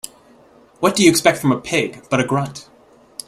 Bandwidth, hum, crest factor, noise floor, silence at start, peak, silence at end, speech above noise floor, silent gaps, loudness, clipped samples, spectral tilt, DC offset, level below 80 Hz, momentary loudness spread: 16 kHz; none; 20 dB; -49 dBFS; 0.8 s; 0 dBFS; 0.65 s; 32 dB; none; -17 LUFS; under 0.1%; -4 dB/octave; under 0.1%; -54 dBFS; 21 LU